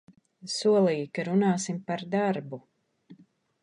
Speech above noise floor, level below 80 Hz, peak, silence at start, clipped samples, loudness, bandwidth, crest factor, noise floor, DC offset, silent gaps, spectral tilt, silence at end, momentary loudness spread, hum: 31 dB; -76 dBFS; -12 dBFS; 0.45 s; under 0.1%; -27 LUFS; 11 kHz; 16 dB; -58 dBFS; under 0.1%; none; -5.5 dB/octave; 0.5 s; 16 LU; none